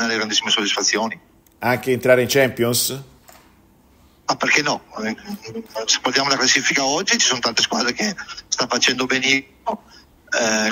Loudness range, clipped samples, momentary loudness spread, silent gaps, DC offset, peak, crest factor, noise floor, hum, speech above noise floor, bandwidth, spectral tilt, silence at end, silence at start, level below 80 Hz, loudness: 4 LU; under 0.1%; 13 LU; none; under 0.1%; 0 dBFS; 20 dB; -53 dBFS; none; 33 dB; 16 kHz; -2 dB/octave; 0 s; 0 s; -58 dBFS; -18 LUFS